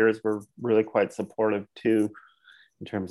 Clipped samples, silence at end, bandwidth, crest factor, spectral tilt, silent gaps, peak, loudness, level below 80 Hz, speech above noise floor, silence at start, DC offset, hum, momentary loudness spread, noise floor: under 0.1%; 0 s; 12 kHz; 16 dB; -7 dB/octave; none; -10 dBFS; -27 LUFS; -72 dBFS; 32 dB; 0 s; under 0.1%; none; 10 LU; -58 dBFS